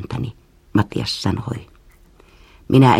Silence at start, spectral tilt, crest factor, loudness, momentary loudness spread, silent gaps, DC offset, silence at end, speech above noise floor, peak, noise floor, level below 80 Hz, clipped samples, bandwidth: 0 s; -6.5 dB/octave; 18 dB; -21 LUFS; 14 LU; none; under 0.1%; 0 s; 32 dB; 0 dBFS; -49 dBFS; -44 dBFS; under 0.1%; 14 kHz